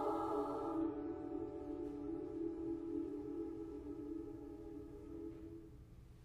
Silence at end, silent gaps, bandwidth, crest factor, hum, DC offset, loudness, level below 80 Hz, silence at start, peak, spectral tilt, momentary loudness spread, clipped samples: 0 s; none; 10.5 kHz; 16 dB; none; under 0.1%; -45 LUFS; -62 dBFS; 0 s; -28 dBFS; -8.5 dB/octave; 12 LU; under 0.1%